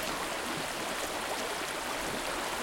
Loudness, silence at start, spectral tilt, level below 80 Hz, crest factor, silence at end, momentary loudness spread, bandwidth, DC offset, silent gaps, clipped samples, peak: -34 LUFS; 0 s; -2 dB/octave; -56 dBFS; 14 dB; 0 s; 1 LU; 17 kHz; under 0.1%; none; under 0.1%; -20 dBFS